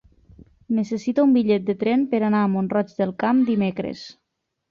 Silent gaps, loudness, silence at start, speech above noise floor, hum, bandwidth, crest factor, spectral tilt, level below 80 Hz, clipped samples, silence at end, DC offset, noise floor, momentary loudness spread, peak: none; -21 LUFS; 0.7 s; 58 dB; none; 7.2 kHz; 14 dB; -8 dB/octave; -60 dBFS; under 0.1%; 0.6 s; under 0.1%; -78 dBFS; 10 LU; -8 dBFS